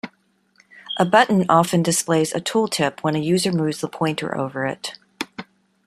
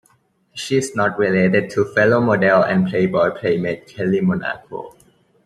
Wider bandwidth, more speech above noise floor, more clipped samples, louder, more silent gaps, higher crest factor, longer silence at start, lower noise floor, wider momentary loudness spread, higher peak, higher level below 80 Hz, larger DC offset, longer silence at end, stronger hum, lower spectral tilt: first, 14.5 kHz vs 12 kHz; about the same, 43 dB vs 42 dB; neither; about the same, -20 LUFS vs -18 LUFS; neither; about the same, 20 dB vs 16 dB; second, 0.05 s vs 0.55 s; about the same, -62 dBFS vs -60 dBFS; about the same, 16 LU vs 14 LU; about the same, -2 dBFS vs -2 dBFS; about the same, -62 dBFS vs -58 dBFS; neither; about the same, 0.45 s vs 0.55 s; neither; second, -4.5 dB/octave vs -6.5 dB/octave